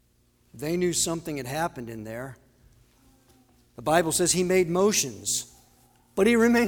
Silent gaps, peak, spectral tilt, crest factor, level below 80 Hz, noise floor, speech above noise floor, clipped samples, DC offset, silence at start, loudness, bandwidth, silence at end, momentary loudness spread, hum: none; -8 dBFS; -3.5 dB/octave; 18 dB; -56 dBFS; -64 dBFS; 40 dB; under 0.1%; under 0.1%; 0.55 s; -25 LUFS; 20 kHz; 0 s; 15 LU; none